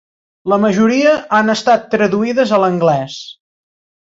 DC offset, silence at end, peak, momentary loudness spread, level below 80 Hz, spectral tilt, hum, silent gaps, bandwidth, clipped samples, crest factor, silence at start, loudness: under 0.1%; 0.8 s; -2 dBFS; 14 LU; -58 dBFS; -5.5 dB/octave; none; none; 7.8 kHz; under 0.1%; 14 dB; 0.45 s; -13 LUFS